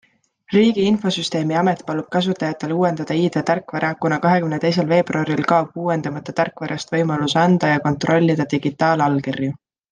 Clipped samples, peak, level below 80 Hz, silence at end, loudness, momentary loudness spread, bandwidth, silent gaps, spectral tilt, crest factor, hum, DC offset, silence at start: under 0.1%; -2 dBFS; -60 dBFS; 0.4 s; -19 LUFS; 7 LU; 9.6 kHz; none; -6.5 dB/octave; 16 dB; none; under 0.1%; 0.5 s